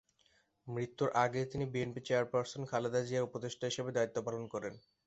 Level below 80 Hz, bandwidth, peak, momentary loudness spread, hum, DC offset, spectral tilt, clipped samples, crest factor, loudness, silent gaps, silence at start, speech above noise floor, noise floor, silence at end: -70 dBFS; 8.2 kHz; -16 dBFS; 9 LU; none; under 0.1%; -5.5 dB/octave; under 0.1%; 20 dB; -37 LUFS; none; 0.65 s; 37 dB; -73 dBFS; 0.3 s